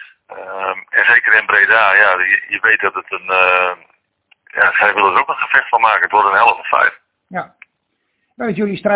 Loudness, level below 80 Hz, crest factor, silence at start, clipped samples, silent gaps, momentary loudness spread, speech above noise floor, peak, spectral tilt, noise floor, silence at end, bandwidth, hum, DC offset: -12 LUFS; -60 dBFS; 14 dB; 0 s; 0.2%; none; 16 LU; 55 dB; 0 dBFS; -7 dB/octave; -69 dBFS; 0 s; 4 kHz; none; under 0.1%